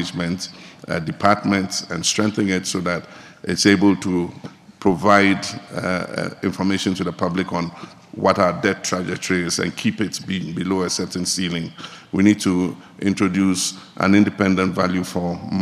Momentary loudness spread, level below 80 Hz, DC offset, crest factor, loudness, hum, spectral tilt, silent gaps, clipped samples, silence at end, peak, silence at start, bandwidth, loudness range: 12 LU; -54 dBFS; under 0.1%; 20 dB; -20 LUFS; none; -4.5 dB/octave; none; under 0.1%; 0 s; 0 dBFS; 0 s; 14.5 kHz; 3 LU